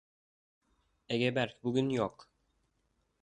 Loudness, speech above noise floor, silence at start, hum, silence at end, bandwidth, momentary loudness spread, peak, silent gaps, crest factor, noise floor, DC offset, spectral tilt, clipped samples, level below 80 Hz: -33 LUFS; 45 dB; 1.1 s; none; 1.15 s; 9.6 kHz; 6 LU; -16 dBFS; none; 20 dB; -77 dBFS; under 0.1%; -6.5 dB/octave; under 0.1%; -70 dBFS